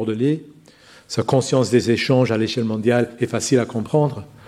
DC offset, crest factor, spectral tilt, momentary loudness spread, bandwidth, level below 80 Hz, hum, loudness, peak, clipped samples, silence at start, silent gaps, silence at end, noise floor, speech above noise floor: under 0.1%; 16 dB; -5.5 dB/octave; 6 LU; 13.5 kHz; -58 dBFS; none; -20 LUFS; -4 dBFS; under 0.1%; 0 s; none; 0.2 s; -48 dBFS; 29 dB